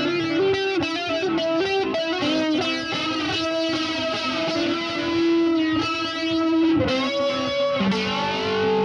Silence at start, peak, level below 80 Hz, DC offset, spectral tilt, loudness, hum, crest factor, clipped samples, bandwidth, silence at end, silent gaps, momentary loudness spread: 0 s; -8 dBFS; -52 dBFS; under 0.1%; -5 dB/octave; -22 LUFS; none; 14 dB; under 0.1%; 9.8 kHz; 0 s; none; 4 LU